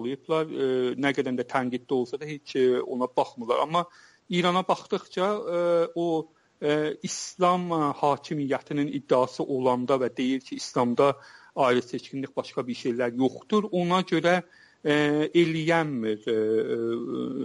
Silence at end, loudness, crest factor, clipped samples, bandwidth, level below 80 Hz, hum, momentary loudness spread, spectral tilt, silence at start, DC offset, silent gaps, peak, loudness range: 0 s; -26 LUFS; 16 dB; under 0.1%; 11.5 kHz; -72 dBFS; none; 9 LU; -5.5 dB/octave; 0 s; under 0.1%; none; -10 dBFS; 2 LU